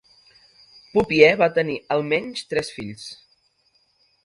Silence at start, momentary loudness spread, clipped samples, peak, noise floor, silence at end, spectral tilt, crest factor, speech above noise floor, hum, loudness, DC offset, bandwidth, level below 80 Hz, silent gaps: 0.95 s; 19 LU; under 0.1%; 0 dBFS; -65 dBFS; 1.1 s; -5 dB/octave; 22 dB; 44 dB; none; -20 LUFS; under 0.1%; 11.5 kHz; -56 dBFS; none